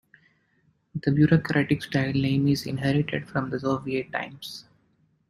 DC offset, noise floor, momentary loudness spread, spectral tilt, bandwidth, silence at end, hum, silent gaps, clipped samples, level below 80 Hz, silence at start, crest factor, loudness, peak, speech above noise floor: under 0.1%; -67 dBFS; 15 LU; -7 dB/octave; 15.5 kHz; 0.7 s; none; none; under 0.1%; -56 dBFS; 0.95 s; 20 dB; -25 LUFS; -6 dBFS; 43 dB